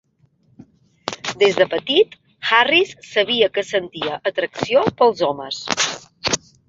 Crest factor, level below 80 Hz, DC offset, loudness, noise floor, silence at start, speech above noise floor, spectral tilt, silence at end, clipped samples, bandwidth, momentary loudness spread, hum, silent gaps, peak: 18 dB; -58 dBFS; under 0.1%; -19 LUFS; -59 dBFS; 1.05 s; 41 dB; -2.5 dB/octave; 0.3 s; under 0.1%; 8 kHz; 11 LU; none; none; -2 dBFS